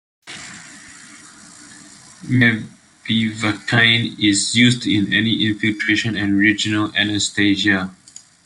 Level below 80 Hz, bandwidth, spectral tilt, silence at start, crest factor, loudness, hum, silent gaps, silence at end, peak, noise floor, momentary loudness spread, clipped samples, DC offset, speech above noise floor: -56 dBFS; 11.5 kHz; -3.5 dB/octave; 0.25 s; 18 dB; -17 LUFS; none; none; 0.5 s; 0 dBFS; -43 dBFS; 20 LU; under 0.1%; under 0.1%; 25 dB